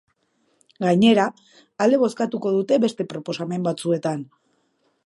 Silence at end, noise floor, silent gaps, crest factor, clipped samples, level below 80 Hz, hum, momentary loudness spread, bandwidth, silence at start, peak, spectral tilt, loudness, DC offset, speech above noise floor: 0.8 s; -67 dBFS; none; 18 dB; under 0.1%; -68 dBFS; none; 12 LU; 11.5 kHz; 0.8 s; -4 dBFS; -6 dB/octave; -21 LUFS; under 0.1%; 47 dB